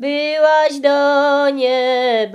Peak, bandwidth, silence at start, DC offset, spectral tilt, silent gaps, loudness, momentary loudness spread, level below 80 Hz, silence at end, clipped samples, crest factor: -2 dBFS; 11 kHz; 0 s; under 0.1%; -3 dB/octave; none; -14 LUFS; 3 LU; -72 dBFS; 0 s; under 0.1%; 12 dB